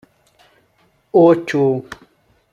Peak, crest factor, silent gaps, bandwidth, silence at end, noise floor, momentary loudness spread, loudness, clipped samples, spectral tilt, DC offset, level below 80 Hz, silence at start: -2 dBFS; 16 dB; none; 9 kHz; 0.6 s; -59 dBFS; 24 LU; -15 LUFS; under 0.1%; -7.5 dB/octave; under 0.1%; -60 dBFS; 1.15 s